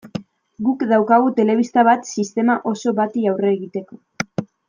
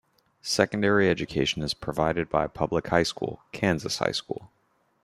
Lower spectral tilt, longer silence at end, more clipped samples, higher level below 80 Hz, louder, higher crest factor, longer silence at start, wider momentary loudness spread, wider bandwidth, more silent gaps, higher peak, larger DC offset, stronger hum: first, -6 dB/octave vs -4.5 dB/octave; second, 0.25 s vs 0.6 s; neither; second, -66 dBFS vs -52 dBFS; first, -18 LUFS vs -26 LUFS; second, 16 dB vs 22 dB; second, 0.05 s vs 0.45 s; first, 14 LU vs 11 LU; second, 9.4 kHz vs 15 kHz; neither; first, -2 dBFS vs -6 dBFS; neither; neither